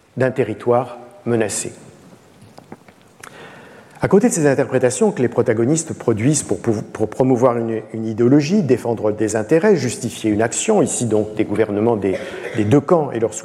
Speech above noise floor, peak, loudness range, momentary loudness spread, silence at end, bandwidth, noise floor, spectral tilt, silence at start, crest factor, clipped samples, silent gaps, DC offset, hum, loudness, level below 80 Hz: 28 dB; -2 dBFS; 6 LU; 10 LU; 0 s; 14 kHz; -45 dBFS; -5.5 dB/octave; 0.15 s; 16 dB; under 0.1%; none; under 0.1%; none; -18 LUFS; -56 dBFS